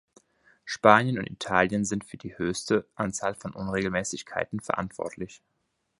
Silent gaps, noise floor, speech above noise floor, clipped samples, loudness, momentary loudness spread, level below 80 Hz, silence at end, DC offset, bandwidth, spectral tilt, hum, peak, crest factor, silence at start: none; -62 dBFS; 35 dB; under 0.1%; -27 LUFS; 15 LU; -58 dBFS; 0.65 s; under 0.1%; 11.5 kHz; -4.5 dB/octave; none; 0 dBFS; 28 dB; 0.65 s